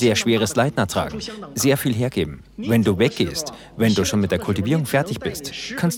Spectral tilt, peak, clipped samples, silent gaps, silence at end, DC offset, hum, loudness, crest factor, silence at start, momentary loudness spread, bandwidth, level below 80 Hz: -5 dB/octave; -4 dBFS; under 0.1%; none; 0 s; under 0.1%; none; -21 LUFS; 16 dB; 0 s; 10 LU; 18.5 kHz; -48 dBFS